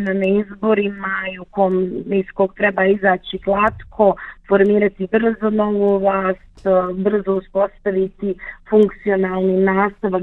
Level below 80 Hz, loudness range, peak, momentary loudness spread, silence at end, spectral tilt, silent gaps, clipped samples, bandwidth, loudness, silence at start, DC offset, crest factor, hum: -46 dBFS; 2 LU; -2 dBFS; 7 LU; 0 s; -9 dB/octave; none; under 0.1%; 4.1 kHz; -18 LUFS; 0 s; under 0.1%; 16 dB; none